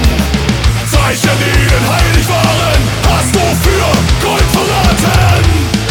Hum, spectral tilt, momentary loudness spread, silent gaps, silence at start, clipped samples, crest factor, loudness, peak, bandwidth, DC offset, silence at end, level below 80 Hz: none; -4.5 dB/octave; 2 LU; none; 0 s; under 0.1%; 10 dB; -10 LUFS; 0 dBFS; 19 kHz; under 0.1%; 0 s; -16 dBFS